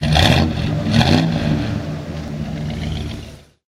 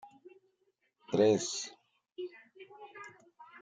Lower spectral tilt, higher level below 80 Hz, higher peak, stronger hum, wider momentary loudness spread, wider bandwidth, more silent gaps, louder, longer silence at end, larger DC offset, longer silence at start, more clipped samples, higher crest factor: first, -6 dB/octave vs -4.5 dB/octave; first, -30 dBFS vs -82 dBFS; first, 0 dBFS vs -14 dBFS; neither; second, 14 LU vs 27 LU; first, 15.5 kHz vs 9.4 kHz; neither; first, -18 LUFS vs -32 LUFS; first, 0.3 s vs 0.05 s; neither; about the same, 0 s vs 0.05 s; neither; about the same, 18 dB vs 22 dB